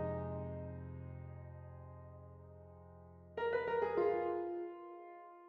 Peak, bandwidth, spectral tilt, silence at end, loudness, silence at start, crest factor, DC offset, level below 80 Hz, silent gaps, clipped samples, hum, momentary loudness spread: -24 dBFS; 5.4 kHz; -6.5 dB/octave; 0 s; -40 LUFS; 0 s; 18 dB; under 0.1%; -70 dBFS; none; under 0.1%; none; 22 LU